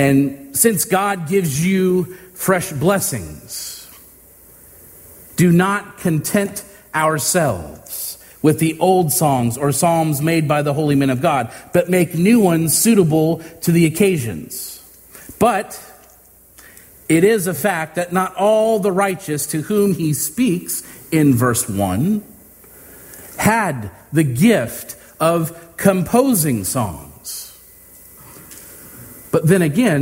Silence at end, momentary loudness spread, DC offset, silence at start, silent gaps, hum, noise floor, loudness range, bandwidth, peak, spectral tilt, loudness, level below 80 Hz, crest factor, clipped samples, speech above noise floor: 0 s; 15 LU; under 0.1%; 0 s; none; none; -48 dBFS; 6 LU; 16.5 kHz; 0 dBFS; -5.5 dB/octave; -17 LUFS; -50 dBFS; 18 dB; under 0.1%; 31 dB